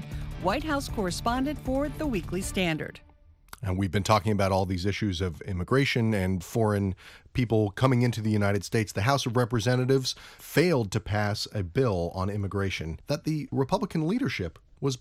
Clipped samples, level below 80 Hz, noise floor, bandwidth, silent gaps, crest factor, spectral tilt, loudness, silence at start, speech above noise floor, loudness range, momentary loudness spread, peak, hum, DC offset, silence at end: under 0.1%; -46 dBFS; -51 dBFS; 16 kHz; none; 22 dB; -6 dB/octave; -28 LUFS; 0 s; 24 dB; 4 LU; 8 LU; -6 dBFS; none; under 0.1%; 0 s